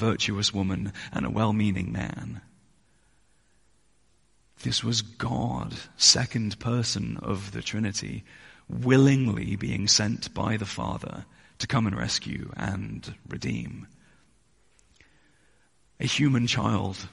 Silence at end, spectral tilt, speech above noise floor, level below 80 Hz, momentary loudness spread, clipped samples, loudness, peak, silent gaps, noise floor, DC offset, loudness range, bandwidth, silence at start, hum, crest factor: 0.05 s; -4 dB/octave; 40 dB; -50 dBFS; 17 LU; under 0.1%; -26 LUFS; -4 dBFS; none; -67 dBFS; under 0.1%; 10 LU; 11.5 kHz; 0 s; none; 24 dB